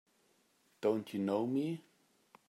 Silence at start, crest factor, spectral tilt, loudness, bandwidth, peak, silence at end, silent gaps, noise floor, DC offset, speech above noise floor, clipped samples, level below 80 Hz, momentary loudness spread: 0.8 s; 18 dB; -7.5 dB/octave; -36 LUFS; 15.5 kHz; -20 dBFS; 0.7 s; none; -73 dBFS; under 0.1%; 38 dB; under 0.1%; -88 dBFS; 6 LU